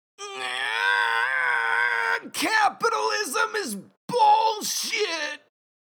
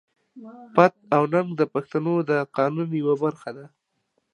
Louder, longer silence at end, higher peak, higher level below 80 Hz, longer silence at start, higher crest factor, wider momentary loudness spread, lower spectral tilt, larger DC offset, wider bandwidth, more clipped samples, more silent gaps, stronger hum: about the same, -23 LUFS vs -23 LUFS; about the same, 0.65 s vs 0.65 s; second, -10 dBFS vs -2 dBFS; second, -86 dBFS vs -74 dBFS; second, 0.2 s vs 0.35 s; second, 14 dB vs 22 dB; second, 11 LU vs 16 LU; second, -1 dB/octave vs -8.5 dB/octave; neither; first, over 20 kHz vs 10.5 kHz; neither; first, 3.97-4.08 s vs none; neither